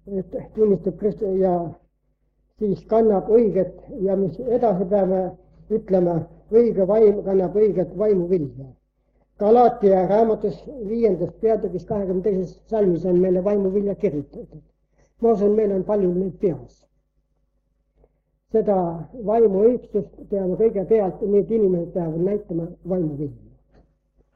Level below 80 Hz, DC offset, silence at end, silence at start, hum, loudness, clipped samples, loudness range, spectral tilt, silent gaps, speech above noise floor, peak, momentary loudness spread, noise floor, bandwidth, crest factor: -50 dBFS; under 0.1%; 1 s; 0.05 s; none; -21 LUFS; under 0.1%; 4 LU; -11 dB/octave; none; 48 dB; -6 dBFS; 11 LU; -68 dBFS; 5.6 kHz; 16 dB